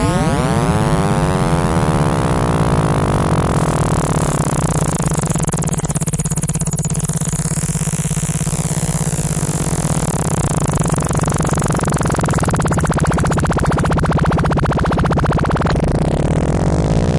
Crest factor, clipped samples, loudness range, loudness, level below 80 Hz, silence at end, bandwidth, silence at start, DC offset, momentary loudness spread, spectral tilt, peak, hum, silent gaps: 12 dB; under 0.1%; 2 LU; -16 LUFS; -26 dBFS; 0 s; 11.5 kHz; 0 s; under 0.1%; 3 LU; -5.5 dB/octave; -4 dBFS; none; none